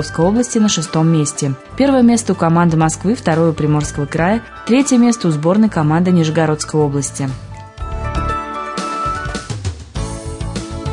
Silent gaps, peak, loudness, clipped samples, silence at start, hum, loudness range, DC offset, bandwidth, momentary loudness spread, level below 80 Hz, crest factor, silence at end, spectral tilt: none; -2 dBFS; -16 LUFS; under 0.1%; 0 s; none; 8 LU; under 0.1%; 11 kHz; 12 LU; -34 dBFS; 14 dB; 0 s; -5.5 dB/octave